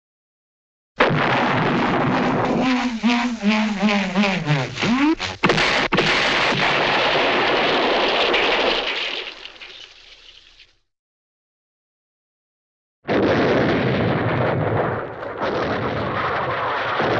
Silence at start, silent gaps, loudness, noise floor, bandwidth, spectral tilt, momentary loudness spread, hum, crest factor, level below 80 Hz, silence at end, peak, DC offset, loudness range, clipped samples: 1 s; 10.99-13.02 s; -19 LUFS; -53 dBFS; 9 kHz; -5 dB/octave; 8 LU; none; 18 dB; -46 dBFS; 0 s; -4 dBFS; under 0.1%; 7 LU; under 0.1%